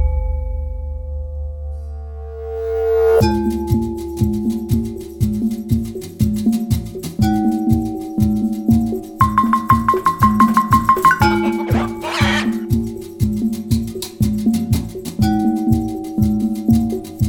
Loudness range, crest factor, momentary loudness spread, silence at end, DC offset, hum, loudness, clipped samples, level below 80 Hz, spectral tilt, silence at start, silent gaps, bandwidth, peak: 5 LU; 16 dB; 13 LU; 0 s; under 0.1%; none; -18 LUFS; under 0.1%; -28 dBFS; -7 dB/octave; 0 s; none; 18 kHz; 0 dBFS